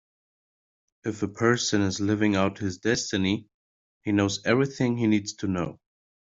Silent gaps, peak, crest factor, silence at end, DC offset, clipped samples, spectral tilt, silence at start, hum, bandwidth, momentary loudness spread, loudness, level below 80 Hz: 3.54-4.01 s; -6 dBFS; 20 dB; 0.6 s; under 0.1%; under 0.1%; -5 dB/octave; 1.05 s; none; 7.8 kHz; 8 LU; -26 LUFS; -62 dBFS